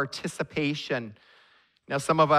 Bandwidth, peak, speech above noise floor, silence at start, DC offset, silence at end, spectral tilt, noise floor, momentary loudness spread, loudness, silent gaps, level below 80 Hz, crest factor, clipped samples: 14.5 kHz; -8 dBFS; 35 dB; 0 s; under 0.1%; 0 s; -5 dB/octave; -62 dBFS; 8 LU; -29 LUFS; none; -64 dBFS; 20 dB; under 0.1%